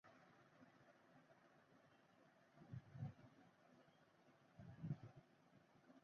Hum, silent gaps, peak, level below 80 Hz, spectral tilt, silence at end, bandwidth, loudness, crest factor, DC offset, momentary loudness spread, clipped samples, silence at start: none; none; -38 dBFS; -82 dBFS; -8 dB/octave; 0 s; 6.6 kHz; -57 LUFS; 24 dB; under 0.1%; 12 LU; under 0.1%; 0.05 s